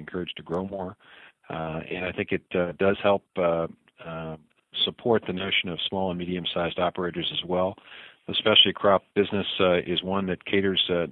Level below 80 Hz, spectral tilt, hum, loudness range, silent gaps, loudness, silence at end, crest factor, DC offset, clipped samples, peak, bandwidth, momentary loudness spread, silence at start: -58 dBFS; -8 dB/octave; none; 5 LU; none; -25 LUFS; 0 s; 22 dB; under 0.1%; under 0.1%; -4 dBFS; 4.7 kHz; 14 LU; 0 s